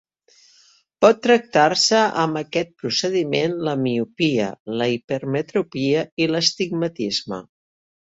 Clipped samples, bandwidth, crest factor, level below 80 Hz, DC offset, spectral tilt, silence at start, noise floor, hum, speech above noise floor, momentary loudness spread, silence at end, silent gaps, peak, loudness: under 0.1%; 8 kHz; 20 dB; -64 dBFS; under 0.1%; -4 dB/octave; 1 s; -56 dBFS; none; 36 dB; 9 LU; 0.65 s; 4.60-4.66 s, 5.04-5.08 s, 6.12-6.17 s; -2 dBFS; -20 LUFS